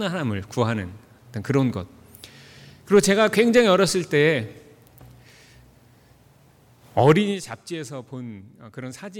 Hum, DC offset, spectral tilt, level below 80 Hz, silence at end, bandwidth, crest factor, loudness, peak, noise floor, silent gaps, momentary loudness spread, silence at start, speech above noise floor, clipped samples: none; under 0.1%; -5 dB/octave; -58 dBFS; 0 s; 18 kHz; 18 dB; -21 LUFS; -6 dBFS; -55 dBFS; none; 21 LU; 0 s; 33 dB; under 0.1%